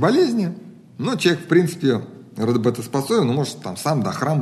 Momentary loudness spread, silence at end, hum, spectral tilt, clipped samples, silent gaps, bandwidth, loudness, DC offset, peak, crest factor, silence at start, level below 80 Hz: 9 LU; 0 s; none; -6 dB/octave; under 0.1%; none; 13 kHz; -21 LUFS; under 0.1%; -4 dBFS; 16 dB; 0 s; -66 dBFS